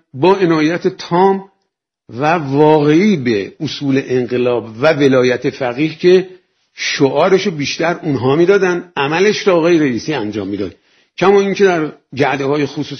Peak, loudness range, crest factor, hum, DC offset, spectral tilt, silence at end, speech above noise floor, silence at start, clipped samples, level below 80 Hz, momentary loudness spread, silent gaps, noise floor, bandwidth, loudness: 0 dBFS; 2 LU; 14 dB; none; under 0.1%; -6 dB/octave; 0 s; 58 dB; 0.15 s; under 0.1%; -56 dBFS; 10 LU; none; -71 dBFS; 6.6 kHz; -14 LUFS